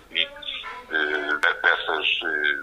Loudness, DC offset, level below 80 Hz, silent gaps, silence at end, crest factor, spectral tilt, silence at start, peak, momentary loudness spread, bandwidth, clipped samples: -23 LUFS; under 0.1%; -58 dBFS; none; 0 s; 22 dB; -2 dB/octave; 0.1 s; -4 dBFS; 10 LU; 15 kHz; under 0.1%